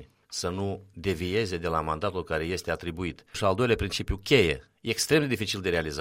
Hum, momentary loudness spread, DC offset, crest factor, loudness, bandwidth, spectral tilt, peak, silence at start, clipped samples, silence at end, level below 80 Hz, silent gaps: none; 10 LU; under 0.1%; 20 dB; -28 LUFS; 16 kHz; -4.5 dB/octave; -8 dBFS; 0 s; under 0.1%; 0 s; -44 dBFS; none